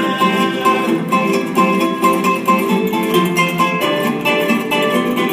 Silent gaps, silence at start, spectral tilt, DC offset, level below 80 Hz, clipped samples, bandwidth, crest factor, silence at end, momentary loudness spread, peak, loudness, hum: none; 0 s; -5 dB/octave; under 0.1%; -60 dBFS; under 0.1%; 16 kHz; 12 dB; 0 s; 2 LU; -2 dBFS; -15 LUFS; none